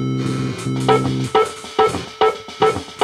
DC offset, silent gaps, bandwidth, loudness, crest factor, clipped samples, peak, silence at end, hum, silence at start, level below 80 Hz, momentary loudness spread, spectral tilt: under 0.1%; none; 13.5 kHz; -19 LUFS; 16 dB; under 0.1%; -2 dBFS; 0 s; none; 0 s; -48 dBFS; 5 LU; -5.5 dB/octave